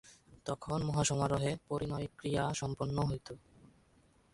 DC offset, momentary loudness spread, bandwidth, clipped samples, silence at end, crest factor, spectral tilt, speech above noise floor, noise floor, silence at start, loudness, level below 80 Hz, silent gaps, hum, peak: under 0.1%; 11 LU; 11.5 kHz; under 0.1%; 0.95 s; 18 dB; -5 dB/octave; 32 dB; -68 dBFS; 0.05 s; -36 LUFS; -56 dBFS; none; none; -20 dBFS